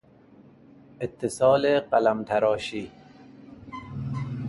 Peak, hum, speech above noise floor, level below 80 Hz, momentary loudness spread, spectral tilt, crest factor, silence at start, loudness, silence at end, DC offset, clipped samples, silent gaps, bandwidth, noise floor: -8 dBFS; none; 30 dB; -58 dBFS; 20 LU; -6 dB/octave; 18 dB; 1 s; -25 LUFS; 0 s; under 0.1%; under 0.1%; none; 11.5 kHz; -53 dBFS